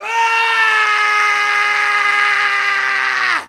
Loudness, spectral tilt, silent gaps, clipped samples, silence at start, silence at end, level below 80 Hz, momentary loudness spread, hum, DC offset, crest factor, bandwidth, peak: -13 LUFS; 1.5 dB/octave; none; under 0.1%; 0 s; 0.05 s; -78 dBFS; 3 LU; none; under 0.1%; 14 dB; 15.5 kHz; 0 dBFS